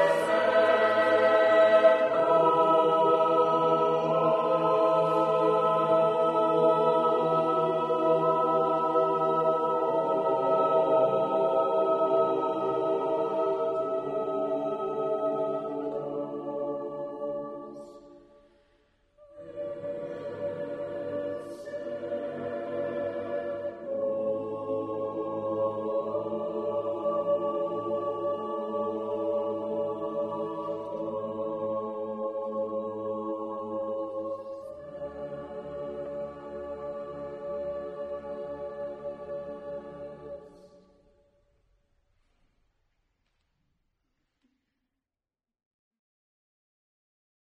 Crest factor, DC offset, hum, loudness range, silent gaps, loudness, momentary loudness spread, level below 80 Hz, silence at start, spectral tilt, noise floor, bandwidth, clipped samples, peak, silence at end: 20 dB; under 0.1%; none; 15 LU; none; -28 LUFS; 15 LU; -68 dBFS; 0 s; -6.5 dB/octave; under -90 dBFS; 10.5 kHz; under 0.1%; -8 dBFS; 6.8 s